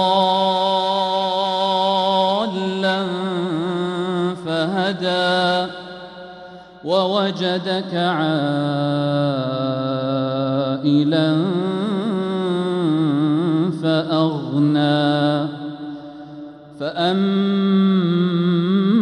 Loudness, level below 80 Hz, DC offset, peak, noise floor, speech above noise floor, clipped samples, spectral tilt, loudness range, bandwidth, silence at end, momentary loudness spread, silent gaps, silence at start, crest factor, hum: -19 LUFS; -62 dBFS; under 0.1%; -4 dBFS; -39 dBFS; 21 dB; under 0.1%; -7 dB/octave; 2 LU; 10.5 kHz; 0 s; 13 LU; none; 0 s; 14 dB; none